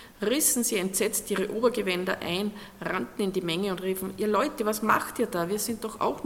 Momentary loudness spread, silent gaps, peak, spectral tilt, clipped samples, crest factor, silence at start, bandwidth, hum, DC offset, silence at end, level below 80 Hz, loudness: 8 LU; none; -8 dBFS; -3.5 dB/octave; under 0.1%; 20 dB; 0 s; 17 kHz; none; under 0.1%; 0 s; -58 dBFS; -27 LUFS